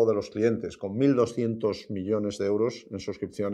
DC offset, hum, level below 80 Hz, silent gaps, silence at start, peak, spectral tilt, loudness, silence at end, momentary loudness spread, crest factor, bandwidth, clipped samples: under 0.1%; none; -64 dBFS; none; 0 s; -10 dBFS; -7 dB/octave; -28 LUFS; 0 s; 10 LU; 16 dB; 11 kHz; under 0.1%